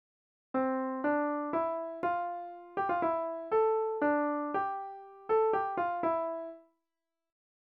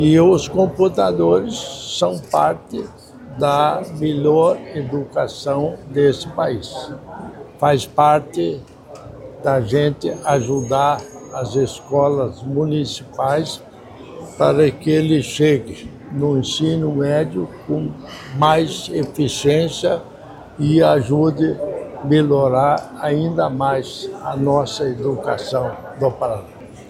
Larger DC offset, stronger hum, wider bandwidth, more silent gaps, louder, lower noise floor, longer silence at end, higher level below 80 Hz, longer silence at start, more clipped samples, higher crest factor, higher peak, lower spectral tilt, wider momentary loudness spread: neither; neither; second, 4.7 kHz vs 14.5 kHz; neither; second, -32 LUFS vs -18 LUFS; first, under -90 dBFS vs -38 dBFS; first, 1.15 s vs 0 s; second, -74 dBFS vs -48 dBFS; first, 0.55 s vs 0 s; neither; about the same, 16 dB vs 18 dB; second, -18 dBFS vs 0 dBFS; second, -4.5 dB/octave vs -6 dB/octave; second, 11 LU vs 15 LU